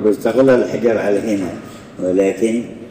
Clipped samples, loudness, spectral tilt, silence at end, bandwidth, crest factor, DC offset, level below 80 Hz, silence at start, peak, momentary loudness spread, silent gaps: under 0.1%; -16 LUFS; -6.5 dB/octave; 0 s; 15.5 kHz; 12 dB; under 0.1%; -54 dBFS; 0 s; -4 dBFS; 12 LU; none